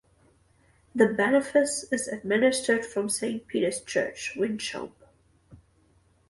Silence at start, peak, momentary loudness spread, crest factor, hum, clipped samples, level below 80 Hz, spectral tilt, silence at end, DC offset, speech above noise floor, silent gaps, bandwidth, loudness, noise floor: 0.95 s; -6 dBFS; 10 LU; 22 dB; none; under 0.1%; -66 dBFS; -3.5 dB/octave; 0.75 s; under 0.1%; 38 dB; none; 12 kHz; -26 LUFS; -64 dBFS